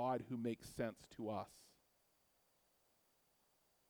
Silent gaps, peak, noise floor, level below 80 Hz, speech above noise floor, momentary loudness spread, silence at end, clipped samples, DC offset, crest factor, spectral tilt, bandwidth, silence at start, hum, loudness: none; -28 dBFS; -79 dBFS; -76 dBFS; 33 dB; 11 LU; 2.25 s; under 0.1%; under 0.1%; 20 dB; -6.5 dB/octave; over 20 kHz; 0 s; none; -46 LUFS